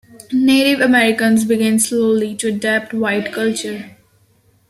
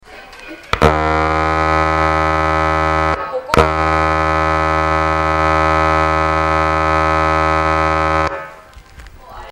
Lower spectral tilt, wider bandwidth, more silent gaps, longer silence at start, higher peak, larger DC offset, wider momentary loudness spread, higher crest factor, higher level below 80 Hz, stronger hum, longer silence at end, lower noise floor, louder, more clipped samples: second, -3.5 dB/octave vs -6 dB/octave; first, 14 kHz vs 12.5 kHz; neither; first, 0.3 s vs 0.1 s; about the same, -2 dBFS vs 0 dBFS; neither; about the same, 8 LU vs 6 LU; about the same, 14 dB vs 16 dB; second, -60 dBFS vs -28 dBFS; neither; first, 0.8 s vs 0 s; first, -55 dBFS vs -38 dBFS; about the same, -15 LUFS vs -14 LUFS; neither